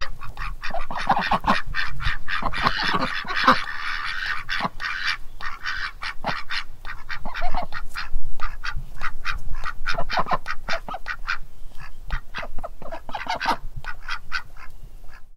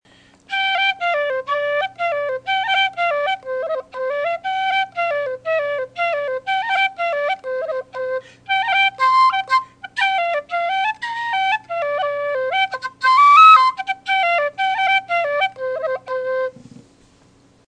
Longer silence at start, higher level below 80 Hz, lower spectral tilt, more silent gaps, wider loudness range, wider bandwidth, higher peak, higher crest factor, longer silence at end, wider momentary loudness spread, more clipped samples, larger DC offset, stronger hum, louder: second, 0 s vs 0.5 s; first, -32 dBFS vs -68 dBFS; first, -4 dB/octave vs -1.5 dB/octave; neither; about the same, 8 LU vs 8 LU; second, 6.8 kHz vs 9.8 kHz; about the same, -2 dBFS vs 0 dBFS; about the same, 20 dB vs 18 dB; second, 0 s vs 0.9 s; first, 14 LU vs 10 LU; neither; neither; neither; second, -27 LUFS vs -18 LUFS